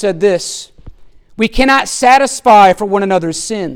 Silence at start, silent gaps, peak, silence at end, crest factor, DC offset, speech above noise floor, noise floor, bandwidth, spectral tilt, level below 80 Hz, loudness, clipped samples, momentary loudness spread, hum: 0 s; none; 0 dBFS; 0 s; 12 dB; under 0.1%; 24 dB; -35 dBFS; 17 kHz; -3.5 dB/octave; -32 dBFS; -11 LUFS; under 0.1%; 11 LU; none